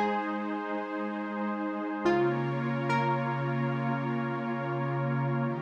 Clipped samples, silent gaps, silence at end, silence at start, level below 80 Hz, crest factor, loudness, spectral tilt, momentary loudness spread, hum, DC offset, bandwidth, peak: under 0.1%; none; 0 s; 0 s; -70 dBFS; 16 dB; -31 LUFS; -8.5 dB/octave; 6 LU; none; under 0.1%; 7 kHz; -14 dBFS